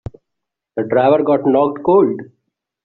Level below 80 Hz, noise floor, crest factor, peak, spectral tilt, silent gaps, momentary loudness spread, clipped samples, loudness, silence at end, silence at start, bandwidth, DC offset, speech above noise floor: -52 dBFS; -80 dBFS; 14 dB; -2 dBFS; -6.5 dB/octave; none; 15 LU; under 0.1%; -15 LUFS; 0.6 s; 0.75 s; 4.3 kHz; under 0.1%; 66 dB